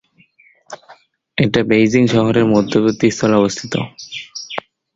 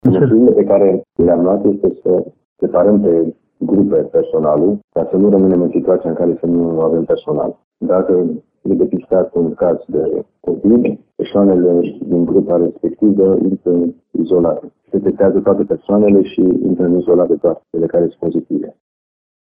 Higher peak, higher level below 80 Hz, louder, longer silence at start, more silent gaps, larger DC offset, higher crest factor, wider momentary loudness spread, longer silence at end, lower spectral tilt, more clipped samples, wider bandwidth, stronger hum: about the same, 0 dBFS vs 0 dBFS; about the same, -50 dBFS vs -48 dBFS; about the same, -15 LUFS vs -14 LUFS; first, 0.7 s vs 0.05 s; second, none vs 2.45-2.56 s, 4.84-4.88 s, 7.64-7.71 s; neither; about the same, 16 dB vs 14 dB; first, 17 LU vs 9 LU; second, 0.35 s vs 0.85 s; second, -5.5 dB/octave vs -12.5 dB/octave; neither; first, 7.8 kHz vs 3.7 kHz; neither